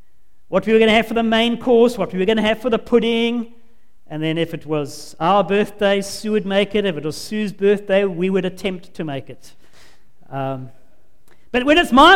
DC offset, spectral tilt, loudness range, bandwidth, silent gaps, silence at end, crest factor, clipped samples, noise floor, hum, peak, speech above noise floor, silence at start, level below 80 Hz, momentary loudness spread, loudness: 2%; -5 dB/octave; 7 LU; 16.5 kHz; none; 0 s; 18 dB; under 0.1%; -59 dBFS; none; 0 dBFS; 41 dB; 0.5 s; -44 dBFS; 13 LU; -18 LUFS